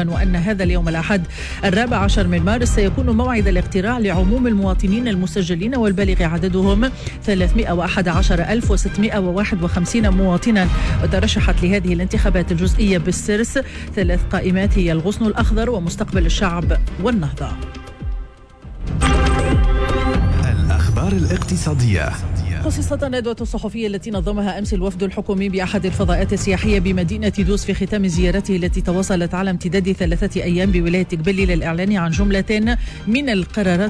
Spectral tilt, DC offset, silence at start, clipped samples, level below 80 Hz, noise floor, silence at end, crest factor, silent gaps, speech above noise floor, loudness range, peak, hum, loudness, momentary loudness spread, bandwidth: -6 dB/octave; under 0.1%; 0 s; under 0.1%; -22 dBFS; -37 dBFS; 0 s; 10 dB; none; 20 dB; 3 LU; -6 dBFS; none; -18 LUFS; 5 LU; 11 kHz